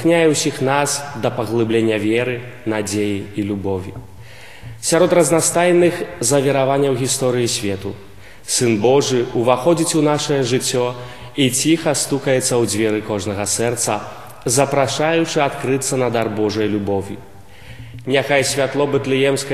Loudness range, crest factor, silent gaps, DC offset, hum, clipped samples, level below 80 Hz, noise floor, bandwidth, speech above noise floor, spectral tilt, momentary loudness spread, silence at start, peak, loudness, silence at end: 4 LU; 18 dB; none; 0.8%; none; under 0.1%; -52 dBFS; -40 dBFS; 14.5 kHz; 23 dB; -4 dB/octave; 11 LU; 0 s; 0 dBFS; -17 LUFS; 0 s